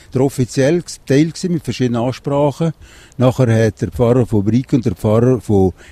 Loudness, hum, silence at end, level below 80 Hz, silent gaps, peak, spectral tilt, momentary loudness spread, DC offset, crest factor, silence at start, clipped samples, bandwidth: -16 LUFS; none; 0.2 s; -40 dBFS; none; 0 dBFS; -7 dB/octave; 6 LU; under 0.1%; 14 dB; 0.15 s; under 0.1%; 14 kHz